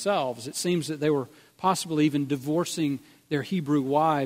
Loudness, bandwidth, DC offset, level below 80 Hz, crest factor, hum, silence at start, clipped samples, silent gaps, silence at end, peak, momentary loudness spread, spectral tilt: -27 LUFS; 16 kHz; under 0.1%; -68 dBFS; 16 dB; none; 0 s; under 0.1%; none; 0 s; -10 dBFS; 7 LU; -5.5 dB/octave